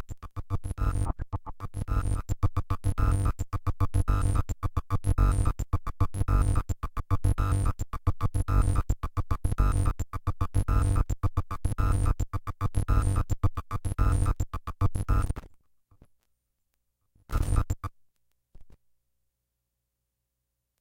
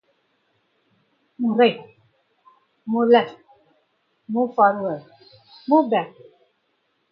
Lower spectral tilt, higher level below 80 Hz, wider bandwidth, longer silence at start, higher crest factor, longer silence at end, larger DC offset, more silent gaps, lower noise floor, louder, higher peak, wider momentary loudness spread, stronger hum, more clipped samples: second, -7 dB/octave vs -8.5 dB/octave; first, -30 dBFS vs -76 dBFS; first, 16.5 kHz vs 5.4 kHz; second, 0 s vs 1.4 s; second, 16 dB vs 22 dB; first, 2.1 s vs 1.05 s; neither; neither; first, -82 dBFS vs -70 dBFS; second, -30 LUFS vs -20 LUFS; second, -12 dBFS vs -2 dBFS; second, 8 LU vs 19 LU; first, 60 Hz at -50 dBFS vs none; neither